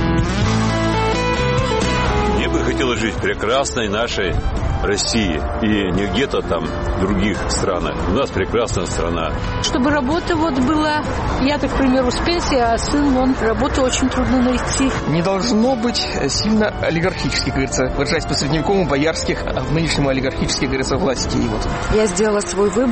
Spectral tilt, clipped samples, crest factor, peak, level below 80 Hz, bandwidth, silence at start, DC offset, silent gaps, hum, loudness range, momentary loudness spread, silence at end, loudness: -5 dB/octave; under 0.1%; 12 dB; -6 dBFS; -28 dBFS; 8.8 kHz; 0 s; 0.2%; none; none; 2 LU; 4 LU; 0 s; -18 LUFS